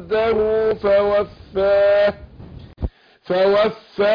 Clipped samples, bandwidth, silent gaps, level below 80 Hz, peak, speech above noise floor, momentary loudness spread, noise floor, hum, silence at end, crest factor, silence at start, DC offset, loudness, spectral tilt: under 0.1%; 5.2 kHz; none; -40 dBFS; -8 dBFS; 22 dB; 16 LU; -39 dBFS; none; 0 s; 12 dB; 0 s; under 0.1%; -18 LUFS; -7.5 dB/octave